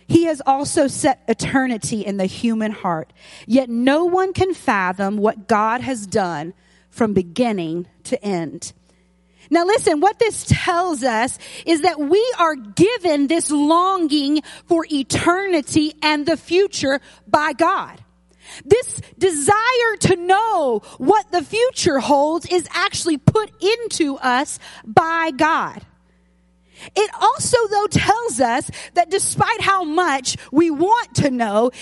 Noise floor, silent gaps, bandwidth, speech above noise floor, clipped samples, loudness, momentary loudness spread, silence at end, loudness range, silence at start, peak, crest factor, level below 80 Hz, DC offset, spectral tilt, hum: -57 dBFS; none; 11.5 kHz; 39 dB; under 0.1%; -18 LUFS; 7 LU; 0 s; 3 LU; 0.1 s; 0 dBFS; 18 dB; -48 dBFS; under 0.1%; -4.5 dB/octave; none